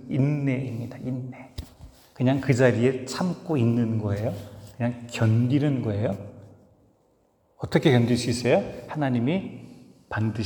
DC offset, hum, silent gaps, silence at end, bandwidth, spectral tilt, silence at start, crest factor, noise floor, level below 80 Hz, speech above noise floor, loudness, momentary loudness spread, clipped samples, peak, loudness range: under 0.1%; none; none; 0 s; 19.5 kHz; -7 dB/octave; 0 s; 20 dB; -65 dBFS; -56 dBFS; 41 dB; -25 LUFS; 18 LU; under 0.1%; -4 dBFS; 2 LU